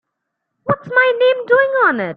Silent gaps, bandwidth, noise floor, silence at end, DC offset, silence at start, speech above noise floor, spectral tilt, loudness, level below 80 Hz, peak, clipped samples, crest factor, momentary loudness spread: none; 4.7 kHz; -76 dBFS; 0 s; under 0.1%; 0.65 s; 62 dB; -7.5 dB/octave; -14 LUFS; -62 dBFS; -2 dBFS; under 0.1%; 14 dB; 9 LU